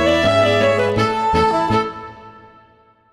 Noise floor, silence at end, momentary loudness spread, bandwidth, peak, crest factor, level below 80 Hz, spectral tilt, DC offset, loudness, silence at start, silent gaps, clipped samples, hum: -52 dBFS; 0.8 s; 12 LU; 13 kHz; -4 dBFS; 14 dB; -40 dBFS; -5.5 dB/octave; under 0.1%; -16 LUFS; 0 s; none; under 0.1%; none